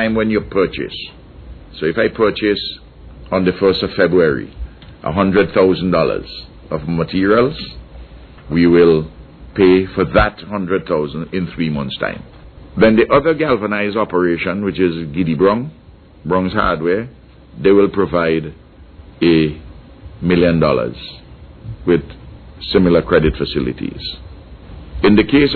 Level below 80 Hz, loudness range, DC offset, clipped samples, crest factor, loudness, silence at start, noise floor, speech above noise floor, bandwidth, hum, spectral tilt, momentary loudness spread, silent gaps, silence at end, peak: -36 dBFS; 3 LU; under 0.1%; under 0.1%; 14 dB; -16 LUFS; 0 s; -39 dBFS; 25 dB; 4.6 kHz; none; -10 dB/octave; 19 LU; none; 0 s; -2 dBFS